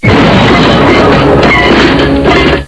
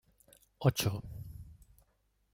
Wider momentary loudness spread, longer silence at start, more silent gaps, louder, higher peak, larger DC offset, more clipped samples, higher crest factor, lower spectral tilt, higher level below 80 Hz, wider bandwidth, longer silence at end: second, 2 LU vs 22 LU; second, 0 s vs 0.6 s; neither; first, -5 LUFS vs -33 LUFS; first, 0 dBFS vs -14 dBFS; neither; first, 3% vs under 0.1%; second, 6 dB vs 24 dB; about the same, -6 dB/octave vs -5 dB/octave; first, -20 dBFS vs -56 dBFS; second, 11 kHz vs 16.5 kHz; second, 0 s vs 0.8 s